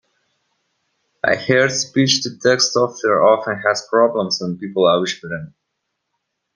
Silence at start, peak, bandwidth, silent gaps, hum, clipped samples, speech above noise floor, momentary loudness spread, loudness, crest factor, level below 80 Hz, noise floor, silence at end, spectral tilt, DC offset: 1.25 s; 0 dBFS; 10.5 kHz; none; none; under 0.1%; 58 dB; 8 LU; -17 LUFS; 18 dB; -62 dBFS; -75 dBFS; 1.05 s; -3.5 dB/octave; under 0.1%